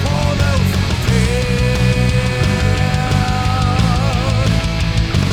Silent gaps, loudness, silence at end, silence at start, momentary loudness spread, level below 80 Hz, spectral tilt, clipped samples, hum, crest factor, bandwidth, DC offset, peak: none; -16 LUFS; 0 s; 0 s; 2 LU; -22 dBFS; -5.5 dB/octave; under 0.1%; none; 12 dB; 15.5 kHz; under 0.1%; -2 dBFS